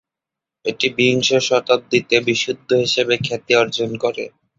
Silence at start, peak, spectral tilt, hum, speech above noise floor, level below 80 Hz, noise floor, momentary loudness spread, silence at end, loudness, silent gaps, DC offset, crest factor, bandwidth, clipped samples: 0.65 s; 0 dBFS; -3.5 dB/octave; none; 68 dB; -58 dBFS; -86 dBFS; 7 LU; 0.3 s; -17 LUFS; none; under 0.1%; 18 dB; 7.8 kHz; under 0.1%